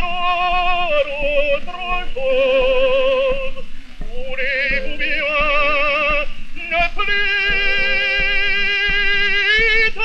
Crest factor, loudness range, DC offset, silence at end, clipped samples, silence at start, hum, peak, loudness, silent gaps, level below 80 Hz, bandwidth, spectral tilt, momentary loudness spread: 14 dB; 3 LU; under 0.1%; 0 s; under 0.1%; 0 s; none; -2 dBFS; -16 LUFS; none; -26 dBFS; 6.6 kHz; -3.5 dB/octave; 9 LU